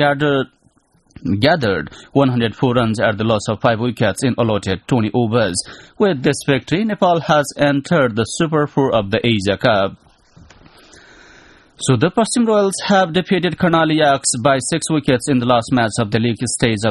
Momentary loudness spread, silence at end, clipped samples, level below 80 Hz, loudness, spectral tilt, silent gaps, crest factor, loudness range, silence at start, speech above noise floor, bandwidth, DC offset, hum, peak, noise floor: 4 LU; 0 s; under 0.1%; -46 dBFS; -16 LUFS; -5 dB/octave; none; 16 dB; 4 LU; 0 s; 40 dB; 12 kHz; under 0.1%; none; 0 dBFS; -56 dBFS